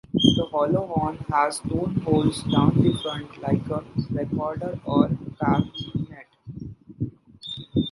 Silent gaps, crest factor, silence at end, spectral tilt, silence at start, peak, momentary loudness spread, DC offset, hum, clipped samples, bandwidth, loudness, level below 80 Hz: none; 24 dB; 0 s; -6.5 dB/octave; 0.15 s; 0 dBFS; 16 LU; under 0.1%; none; under 0.1%; 11.5 kHz; -24 LUFS; -46 dBFS